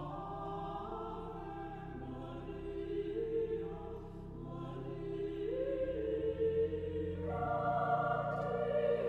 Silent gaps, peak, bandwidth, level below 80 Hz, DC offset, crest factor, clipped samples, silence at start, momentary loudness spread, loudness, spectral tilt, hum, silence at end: none; -22 dBFS; 5.6 kHz; -54 dBFS; under 0.1%; 16 dB; under 0.1%; 0 s; 11 LU; -39 LUFS; -9 dB/octave; none; 0 s